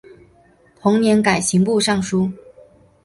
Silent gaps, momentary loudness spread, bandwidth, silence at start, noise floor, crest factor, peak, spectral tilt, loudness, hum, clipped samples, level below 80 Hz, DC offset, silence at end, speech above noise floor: none; 7 LU; 11.5 kHz; 0.85 s; -53 dBFS; 16 dB; -2 dBFS; -5 dB/octave; -17 LUFS; none; under 0.1%; -52 dBFS; under 0.1%; 0.7 s; 36 dB